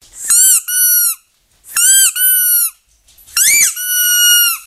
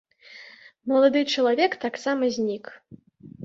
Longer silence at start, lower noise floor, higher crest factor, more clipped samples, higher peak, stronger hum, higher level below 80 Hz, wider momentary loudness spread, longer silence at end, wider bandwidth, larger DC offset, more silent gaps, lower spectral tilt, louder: second, 0.15 s vs 0.3 s; first, -52 dBFS vs -48 dBFS; second, 12 dB vs 18 dB; neither; first, 0 dBFS vs -8 dBFS; neither; first, -56 dBFS vs -70 dBFS; second, 9 LU vs 24 LU; about the same, 0.05 s vs 0 s; first, 16 kHz vs 7.8 kHz; neither; neither; second, 5.5 dB/octave vs -4 dB/octave; first, -9 LUFS vs -23 LUFS